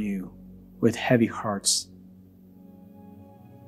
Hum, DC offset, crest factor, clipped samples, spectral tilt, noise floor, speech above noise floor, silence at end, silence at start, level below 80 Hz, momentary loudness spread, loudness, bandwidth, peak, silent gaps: none; under 0.1%; 22 dB; under 0.1%; -4 dB/octave; -51 dBFS; 27 dB; 0.1 s; 0 s; -60 dBFS; 22 LU; -25 LUFS; 15.5 kHz; -6 dBFS; none